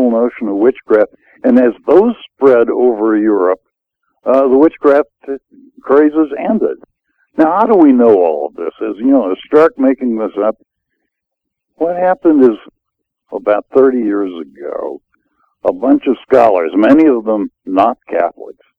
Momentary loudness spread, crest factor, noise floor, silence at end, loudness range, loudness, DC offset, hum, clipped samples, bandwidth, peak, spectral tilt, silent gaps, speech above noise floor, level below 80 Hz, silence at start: 13 LU; 12 dB; -77 dBFS; 0.25 s; 4 LU; -12 LUFS; under 0.1%; none; 0.2%; 5.4 kHz; 0 dBFS; -8.5 dB/octave; none; 65 dB; -54 dBFS; 0 s